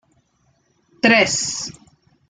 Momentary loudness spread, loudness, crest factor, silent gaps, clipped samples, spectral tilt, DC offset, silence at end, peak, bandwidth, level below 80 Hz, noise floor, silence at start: 14 LU; -17 LUFS; 20 dB; none; under 0.1%; -2 dB/octave; under 0.1%; 0.6 s; -2 dBFS; 9.6 kHz; -60 dBFS; -63 dBFS; 1.05 s